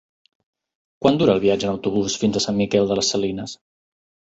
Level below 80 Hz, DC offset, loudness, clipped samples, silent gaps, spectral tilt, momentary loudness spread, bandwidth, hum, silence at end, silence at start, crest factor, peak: -52 dBFS; under 0.1%; -20 LUFS; under 0.1%; none; -4.5 dB/octave; 10 LU; 8.2 kHz; none; 0.75 s; 1 s; 20 dB; -2 dBFS